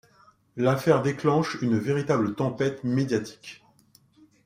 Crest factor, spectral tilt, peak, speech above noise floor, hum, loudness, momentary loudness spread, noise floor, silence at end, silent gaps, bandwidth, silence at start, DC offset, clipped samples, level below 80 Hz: 20 dB; -7 dB/octave; -6 dBFS; 36 dB; none; -25 LUFS; 15 LU; -60 dBFS; 0.9 s; none; 16 kHz; 0.55 s; under 0.1%; under 0.1%; -64 dBFS